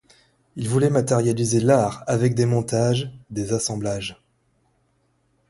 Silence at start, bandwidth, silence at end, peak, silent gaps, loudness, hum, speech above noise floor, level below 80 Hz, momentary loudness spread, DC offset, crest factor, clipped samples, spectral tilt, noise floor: 0.55 s; 11.5 kHz; 1.35 s; -4 dBFS; none; -22 LUFS; none; 45 dB; -54 dBFS; 12 LU; under 0.1%; 18 dB; under 0.1%; -6 dB/octave; -66 dBFS